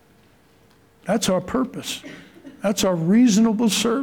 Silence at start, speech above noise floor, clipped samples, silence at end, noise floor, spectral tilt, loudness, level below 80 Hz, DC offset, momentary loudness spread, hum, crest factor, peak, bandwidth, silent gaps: 1.05 s; 36 dB; under 0.1%; 0 s; -55 dBFS; -4.5 dB/octave; -20 LUFS; -56 dBFS; under 0.1%; 15 LU; none; 14 dB; -8 dBFS; 18 kHz; none